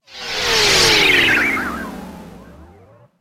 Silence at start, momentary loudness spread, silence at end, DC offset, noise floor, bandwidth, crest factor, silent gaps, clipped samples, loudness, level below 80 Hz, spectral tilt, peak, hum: 0.1 s; 20 LU; 0.55 s; under 0.1%; -47 dBFS; 16 kHz; 16 dB; none; under 0.1%; -13 LUFS; -40 dBFS; -1.5 dB/octave; -2 dBFS; none